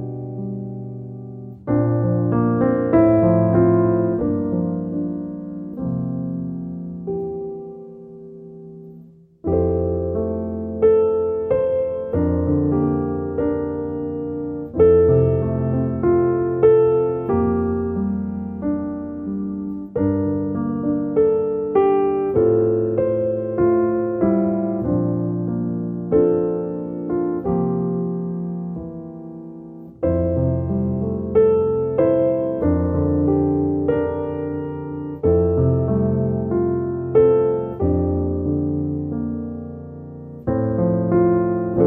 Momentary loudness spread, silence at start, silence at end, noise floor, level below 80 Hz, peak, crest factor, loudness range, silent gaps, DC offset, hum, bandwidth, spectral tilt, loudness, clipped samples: 14 LU; 0 s; 0 s; -45 dBFS; -40 dBFS; -2 dBFS; 16 dB; 7 LU; none; under 0.1%; none; 3.3 kHz; -13.5 dB/octave; -20 LUFS; under 0.1%